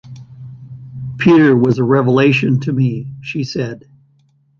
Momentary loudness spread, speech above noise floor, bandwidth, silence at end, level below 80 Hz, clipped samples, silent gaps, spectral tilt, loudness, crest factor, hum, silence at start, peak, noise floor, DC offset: 25 LU; 42 dB; 7.2 kHz; 0.8 s; -52 dBFS; under 0.1%; none; -8 dB/octave; -14 LUFS; 14 dB; none; 0.05 s; -2 dBFS; -55 dBFS; under 0.1%